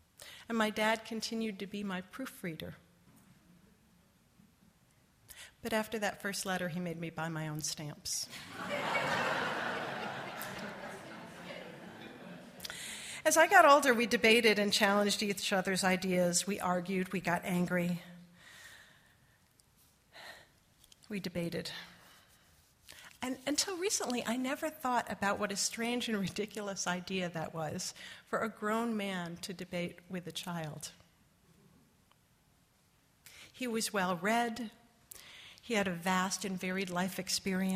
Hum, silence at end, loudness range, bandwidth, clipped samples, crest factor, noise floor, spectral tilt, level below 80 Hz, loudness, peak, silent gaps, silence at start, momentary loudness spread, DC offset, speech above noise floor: none; 0 s; 17 LU; 15.5 kHz; under 0.1%; 26 dB; -69 dBFS; -3.5 dB/octave; -72 dBFS; -33 LUFS; -10 dBFS; none; 0.2 s; 21 LU; under 0.1%; 36 dB